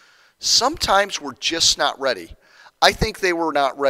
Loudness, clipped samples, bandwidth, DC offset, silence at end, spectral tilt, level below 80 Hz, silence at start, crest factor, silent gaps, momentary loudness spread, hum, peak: -18 LUFS; under 0.1%; 16 kHz; under 0.1%; 0 s; -1.5 dB/octave; -40 dBFS; 0.4 s; 20 dB; none; 8 LU; none; 0 dBFS